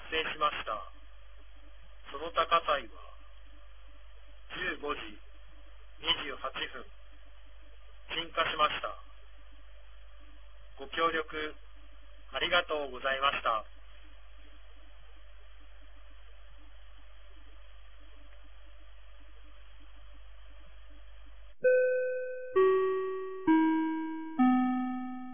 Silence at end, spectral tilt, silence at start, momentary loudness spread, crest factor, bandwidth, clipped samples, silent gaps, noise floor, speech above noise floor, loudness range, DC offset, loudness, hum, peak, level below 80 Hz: 0 s; -1.5 dB/octave; 0 s; 18 LU; 22 dB; 3.6 kHz; under 0.1%; none; -54 dBFS; 22 dB; 9 LU; 0.6%; -31 LUFS; none; -14 dBFS; -54 dBFS